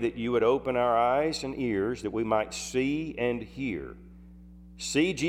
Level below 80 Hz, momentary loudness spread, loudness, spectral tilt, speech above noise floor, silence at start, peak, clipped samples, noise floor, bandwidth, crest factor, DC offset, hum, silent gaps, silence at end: -52 dBFS; 9 LU; -28 LUFS; -5 dB/octave; 21 dB; 0 s; -12 dBFS; under 0.1%; -49 dBFS; 15.5 kHz; 18 dB; under 0.1%; none; none; 0 s